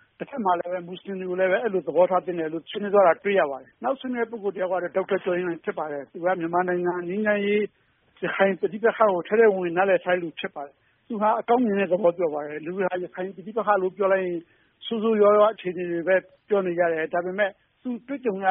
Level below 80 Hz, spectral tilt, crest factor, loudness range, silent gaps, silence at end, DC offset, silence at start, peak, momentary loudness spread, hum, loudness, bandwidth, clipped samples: -72 dBFS; -1 dB/octave; 18 dB; 3 LU; none; 0 s; under 0.1%; 0.2 s; -6 dBFS; 13 LU; none; -24 LUFS; 3.8 kHz; under 0.1%